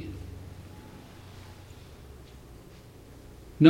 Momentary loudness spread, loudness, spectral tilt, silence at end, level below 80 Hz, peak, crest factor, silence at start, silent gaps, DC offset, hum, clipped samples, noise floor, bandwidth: 7 LU; -48 LUFS; -7.5 dB/octave; 0 s; -52 dBFS; -4 dBFS; 26 dB; 0 s; none; under 0.1%; none; under 0.1%; -50 dBFS; 16.5 kHz